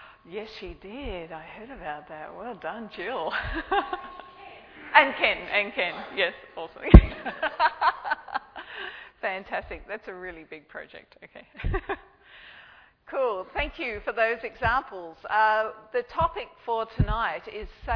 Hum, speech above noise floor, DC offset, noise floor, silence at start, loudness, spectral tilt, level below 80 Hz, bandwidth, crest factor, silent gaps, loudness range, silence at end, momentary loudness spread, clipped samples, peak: none; 27 dB; under 0.1%; -53 dBFS; 0 s; -26 LUFS; -8.5 dB/octave; -32 dBFS; 5.4 kHz; 26 dB; none; 14 LU; 0 s; 19 LU; under 0.1%; 0 dBFS